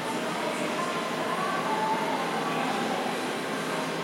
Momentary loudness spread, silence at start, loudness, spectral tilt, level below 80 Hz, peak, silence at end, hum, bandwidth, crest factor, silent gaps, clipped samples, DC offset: 3 LU; 0 s; -29 LUFS; -4 dB/octave; -78 dBFS; -16 dBFS; 0 s; none; 16.5 kHz; 14 dB; none; under 0.1%; under 0.1%